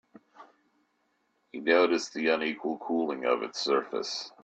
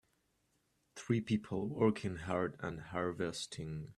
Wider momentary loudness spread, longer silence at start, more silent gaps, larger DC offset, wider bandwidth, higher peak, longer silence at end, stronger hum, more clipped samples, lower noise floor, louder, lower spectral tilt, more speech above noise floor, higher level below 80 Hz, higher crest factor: about the same, 10 LU vs 11 LU; second, 0.4 s vs 0.95 s; neither; neither; second, 8.6 kHz vs 12.5 kHz; first, -10 dBFS vs -18 dBFS; about the same, 0.15 s vs 0.05 s; neither; neither; second, -74 dBFS vs -78 dBFS; first, -28 LUFS vs -38 LUFS; second, -3 dB/octave vs -6 dB/octave; first, 45 dB vs 41 dB; second, -78 dBFS vs -66 dBFS; about the same, 20 dB vs 20 dB